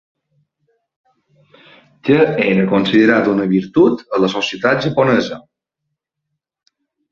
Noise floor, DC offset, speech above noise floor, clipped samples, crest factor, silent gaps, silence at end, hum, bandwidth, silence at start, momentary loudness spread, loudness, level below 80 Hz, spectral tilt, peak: -77 dBFS; under 0.1%; 63 dB; under 0.1%; 16 dB; none; 1.7 s; none; 7.4 kHz; 2.05 s; 5 LU; -15 LUFS; -56 dBFS; -6.5 dB/octave; 0 dBFS